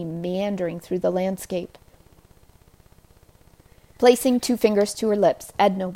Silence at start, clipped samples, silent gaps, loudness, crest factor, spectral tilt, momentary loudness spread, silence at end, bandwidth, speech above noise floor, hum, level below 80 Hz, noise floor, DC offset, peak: 0 s; under 0.1%; none; -22 LUFS; 20 dB; -5 dB/octave; 11 LU; 0 s; 16 kHz; 32 dB; none; -56 dBFS; -54 dBFS; under 0.1%; -4 dBFS